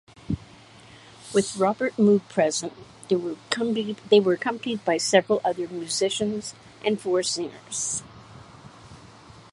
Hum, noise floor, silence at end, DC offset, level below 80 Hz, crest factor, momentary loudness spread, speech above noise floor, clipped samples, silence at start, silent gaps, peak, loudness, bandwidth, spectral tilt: none; -49 dBFS; 0.45 s; under 0.1%; -58 dBFS; 22 dB; 13 LU; 25 dB; under 0.1%; 0.3 s; none; -2 dBFS; -25 LUFS; 11.5 kHz; -4 dB/octave